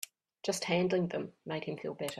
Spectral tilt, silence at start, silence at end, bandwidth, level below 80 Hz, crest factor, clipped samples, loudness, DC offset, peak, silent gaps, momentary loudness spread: -4.5 dB/octave; 0 s; 0 s; 15 kHz; -74 dBFS; 20 dB; under 0.1%; -35 LUFS; under 0.1%; -16 dBFS; none; 10 LU